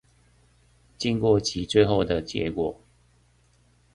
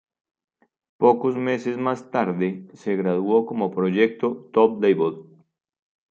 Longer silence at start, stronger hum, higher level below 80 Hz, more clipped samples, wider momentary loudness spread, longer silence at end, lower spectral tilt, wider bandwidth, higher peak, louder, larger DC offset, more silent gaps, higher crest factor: about the same, 1 s vs 1 s; neither; first, -48 dBFS vs -72 dBFS; neither; about the same, 9 LU vs 8 LU; first, 1.2 s vs 0.9 s; second, -5.5 dB/octave vs -8 dB/octave; first, 11 kHz vs 7.4 kHz; about the same, -6 dBFS vs -4 dBFS; about the same, -24 LUFS vs -22 LUFS; neither; neither; about the same, 22 dB vs 20 dB